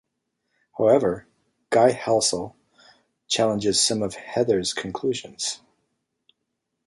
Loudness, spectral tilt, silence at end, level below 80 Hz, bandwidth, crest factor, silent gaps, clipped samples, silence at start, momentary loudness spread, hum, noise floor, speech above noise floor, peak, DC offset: -22 LUFS; -3.5 dB/octave; 1.3 s; -60 dBFS; 11.5 kHz; 20 dB; none; under 0.1%; 0.75 s; 11 LU; none; -79 dBFS; 57 dB; -4 dBFS; under 0.1%